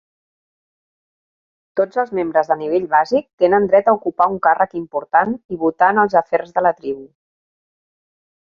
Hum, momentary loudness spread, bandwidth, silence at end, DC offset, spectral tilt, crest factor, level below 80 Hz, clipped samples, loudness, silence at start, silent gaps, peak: none; 8 LU; 7 kHz; 1.45 s; under 0.1%; -7.5 dB/octave; 18 dB; -60 dBFS; under 0.1%; -17 LUFS; 1.75 s; 3.33-3.38 s, 5.45-5.49 s; -2 dBFS